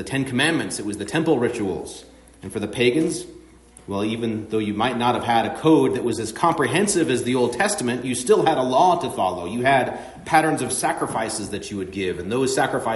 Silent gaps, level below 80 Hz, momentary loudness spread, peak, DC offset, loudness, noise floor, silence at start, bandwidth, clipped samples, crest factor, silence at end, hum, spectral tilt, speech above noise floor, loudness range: none; -54 dBFS; 11 LU; -4 dBFS; under 0.1%; -21 LUFS; -47 dBFS; 0 s; 11.5 kHz; under 0.1%; 18 dB; 0 s; none; -4.5 dB/octave; 26 dB; 5 LU